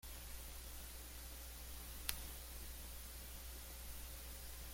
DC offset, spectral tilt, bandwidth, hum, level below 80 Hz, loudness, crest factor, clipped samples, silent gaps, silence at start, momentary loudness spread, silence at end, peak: under 0.1%; -2 dB/octave; 16.5 kHz; none; -54 dBFS; -50 LUFS; 38 dB; under 0.1%; none; 0.05 s; 6 LU; 0 s; -12 dBFS